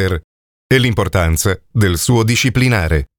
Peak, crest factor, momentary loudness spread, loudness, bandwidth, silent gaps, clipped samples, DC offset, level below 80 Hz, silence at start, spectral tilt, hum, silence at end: 0 dBFS; 14 dB; 4 LU; -15 LUFS; 20 kHz; 0.24-0.70 s; under 0.1%; under 0.1%; -30 dBFS; 0 s; -5 dB/octave; none; 0.15 s